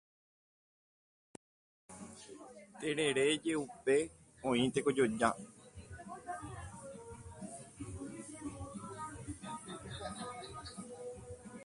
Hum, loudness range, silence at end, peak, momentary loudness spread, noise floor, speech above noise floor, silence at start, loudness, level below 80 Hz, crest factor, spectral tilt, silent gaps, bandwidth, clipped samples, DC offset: none; 13 LU; 0 s; -14 dBFS; 19 LU; under -90 dBFS; over 57 dB; 1.9 s; -38 LUFS; -62 dBFS; 26 dB; -4.5 dB/octave; none; 11.5 kHz; under 0.1%; under 0.1%